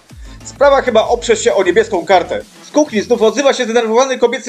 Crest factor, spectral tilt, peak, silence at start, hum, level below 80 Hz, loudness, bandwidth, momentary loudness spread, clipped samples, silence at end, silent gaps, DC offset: 14 dB; -3.5 dB/octave; 0 dBFS; 0.1 s; none; -40 dBFS; -13 LUFS; 12 kHz; 7 LU; under 0.1%; 0 s; none; under 0.1%